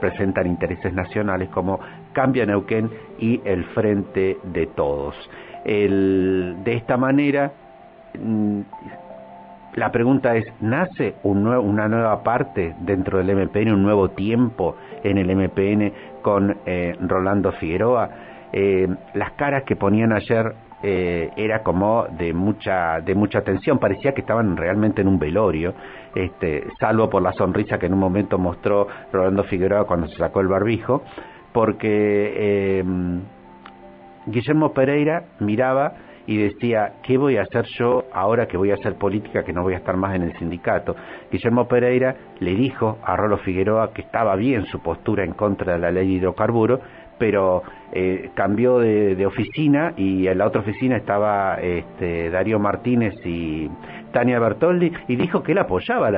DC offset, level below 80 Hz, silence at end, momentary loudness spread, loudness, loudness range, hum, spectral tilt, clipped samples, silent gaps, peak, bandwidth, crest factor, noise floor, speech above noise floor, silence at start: under 0.1%; -48 dBFS; 0 s; 8 LU; -21 LUFS; 2 LU; none; -12 dB/octave; under 0.1%; none; -2 dBFS; 4.9 kHz; 18 dB; -44 dBFS; 24 dB; 0 s